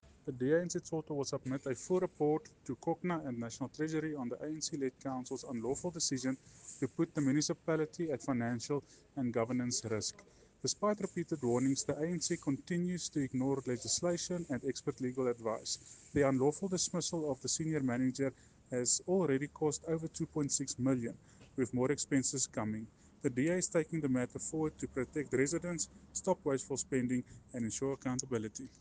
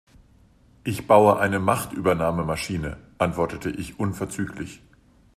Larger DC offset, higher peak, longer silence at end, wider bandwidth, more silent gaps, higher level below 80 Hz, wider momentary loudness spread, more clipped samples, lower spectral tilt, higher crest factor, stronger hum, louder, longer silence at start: neither; second, -16 dBFS vs -2 dBFS; second, 0.1 s vs 0.6 s; second, 10 kHz vs 15 kHz; neither; second, -66 dBFS vs -48 dBFS; second, 8 LU vs 15 LU; neither; second, -4.5 dB/octave vs -6 dB/octave; about the same, 20 dB vs 22 dB; neither; second, -36 LUFS vs -23 LUFS; second, 0.05 s vs 0.85 s